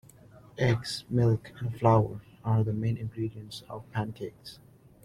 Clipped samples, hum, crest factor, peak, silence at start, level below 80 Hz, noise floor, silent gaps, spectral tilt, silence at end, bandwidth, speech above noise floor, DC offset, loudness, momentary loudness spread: under 0.1%; none; 20 dB; -10 dBFS; 0.55 s; -56 dBFS; -53 dBFS; none; -7 dB/octave; 0.5 s; 12 kHz; 25 dB; under 0.1%; -29 LUFS; 17 LU